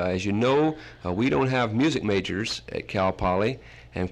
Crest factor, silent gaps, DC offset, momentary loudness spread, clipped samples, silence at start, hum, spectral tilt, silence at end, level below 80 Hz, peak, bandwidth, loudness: 14 dB; none; under 0.1%; 9 LU; under 0.1%; 0 s; none; -6 dB/octave; 0 s; -48 dBFS; -12 dBFS; 11.5 kHz; -25 LUFS